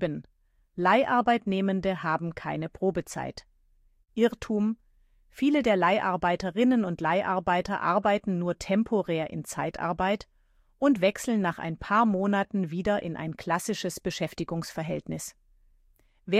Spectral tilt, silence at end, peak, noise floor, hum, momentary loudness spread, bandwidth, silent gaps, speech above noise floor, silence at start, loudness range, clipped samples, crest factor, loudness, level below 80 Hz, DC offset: -5.5 dB/octave; 0 s; -10 dBFS; -64 dBFS; none; 10 LU; 15 kHz; none; 37 dB; 0 s; 5 LU; under 0.1%; 18 dB; -27 LUFS; -56 dBFS; under 0.1%